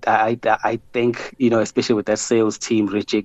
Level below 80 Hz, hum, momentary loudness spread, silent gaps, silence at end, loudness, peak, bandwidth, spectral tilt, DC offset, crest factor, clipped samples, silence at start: -56 dBFS; none; 3 LU; none; 0 s; -20 LUFS; -4 dBFS; 8.4 kHz; -4.5 dB/octave; under 0.1%; 16 dB; under 0.1%; 0 s